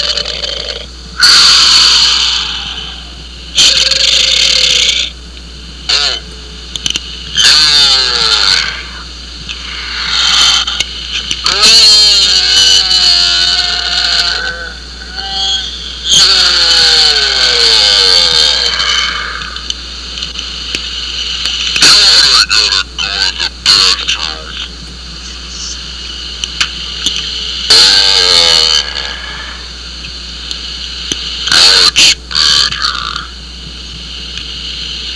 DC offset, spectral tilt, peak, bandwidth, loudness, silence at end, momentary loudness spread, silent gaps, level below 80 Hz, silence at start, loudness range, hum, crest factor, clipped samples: 0.4%; 0.5 dB/octave; 0 dBFS; 11 kHz; -7 LUFS; 0 s; 19 LU; none; -30 dBFS; 0 s; 7 LU; none; 10 dB; 1%